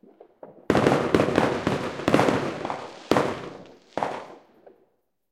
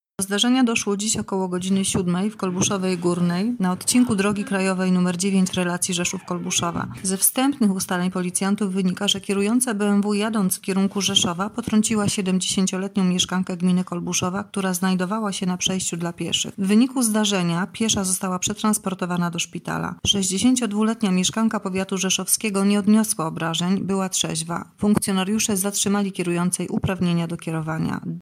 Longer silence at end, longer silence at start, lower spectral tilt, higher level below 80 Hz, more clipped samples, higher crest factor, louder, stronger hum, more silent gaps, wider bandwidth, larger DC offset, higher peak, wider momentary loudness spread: first, 0.95 s vs 0 s; first, 0.45 s vs 0.2 s; first, -6 dB/octave vs -4 dB/octave; about the same, -54 dBFS vs -56 dBFS; neither; about the same, 22 dB vs 18 dB; second, -24 LUFS vs -21 LUFS; neither; neither; about the same, 16.5 kHz vs 16 kHz; neither; about the same, -4 dBFS vs -2 dBFS; first, 16 LU vs 6 LU